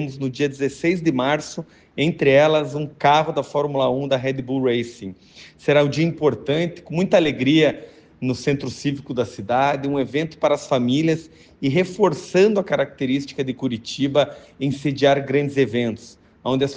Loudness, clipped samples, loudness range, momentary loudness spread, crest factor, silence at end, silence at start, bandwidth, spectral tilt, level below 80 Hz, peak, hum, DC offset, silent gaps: -21 LUFS; under 0.1%; 2 LU; 10 LU; 16 dB; 0 s; 0 s; 9.6 kHz; -6 dB/octave; -56 dBFS; -4 dBFS; none; under 0.1%; none